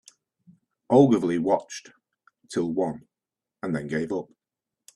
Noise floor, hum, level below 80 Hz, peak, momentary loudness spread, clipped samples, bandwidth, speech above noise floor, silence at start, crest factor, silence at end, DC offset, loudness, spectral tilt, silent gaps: -89 dBFS; none; -66 dBFS; -4 dBFS; 21 LU; under 0.1%; 11.5 kHz; 66 dB; 0.9 s; 22 dB; 0.7 s; under 0.1%; -25 LUFS; -7 dB/octave; none